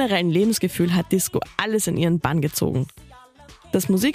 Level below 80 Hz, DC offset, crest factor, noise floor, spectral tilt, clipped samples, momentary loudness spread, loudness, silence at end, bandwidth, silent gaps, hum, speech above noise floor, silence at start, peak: -50 dBFS; under 0.1%; 18 dB; -47 dBFS; -5 dB/octave; under 0.1%; 5 LU; -22 LUFS; 0 s; 15.5 kHz; none; none; 27 dB; 0 s; -4 dBFS